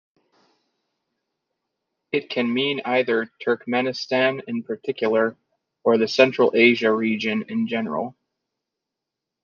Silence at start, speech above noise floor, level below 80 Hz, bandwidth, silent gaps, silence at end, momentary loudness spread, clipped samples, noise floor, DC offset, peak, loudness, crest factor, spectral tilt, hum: 2.15 s; 63 dB; -74 dBFS; 7.2 kHz; none; 1.3 s; 11 LU; under 0.1%; -85 dBFS; under 0.1%; -2 dBFS; -22 LUFS; 20 dB; -5.5 dB/octave; none